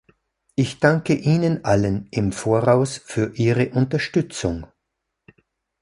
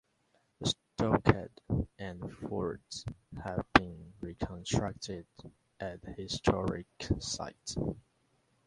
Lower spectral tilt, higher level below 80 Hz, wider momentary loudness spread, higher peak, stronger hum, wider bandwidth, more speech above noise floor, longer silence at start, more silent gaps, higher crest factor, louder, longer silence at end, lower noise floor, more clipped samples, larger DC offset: first, -6.5 dB/octave vs -5 dB/octave; about the same, -46 dBFS vs -50 dBFS; second, 8 LU vs 16 LU; about the same, -2 dBFS vs -4 dBFS; neither; about the same, 11.5 kHz vs 11.5 kHz; first, 59 dB vs 37 dB; about the same, 0.6 s vs 0.6 s; neither; second, 18 dB vs 32 dB; first, -21 LUFS vs -34 LUFS; first, 1.15 s vs 0.65 s; first, -79 dBFS vs -74 dBFS; neither; neither